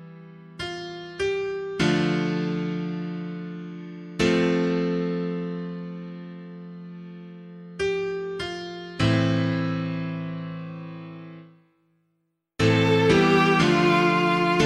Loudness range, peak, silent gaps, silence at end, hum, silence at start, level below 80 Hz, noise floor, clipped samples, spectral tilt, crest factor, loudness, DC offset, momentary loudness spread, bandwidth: 10 LU; -6 dBFS; none; 0 s; none; 0 s; -52 dBFS; -75 dBFS; under 0.1%; -6 dB/octave; 18 dB; -24 LUFS; under 0.1%; 21 LU; 11.5 kHz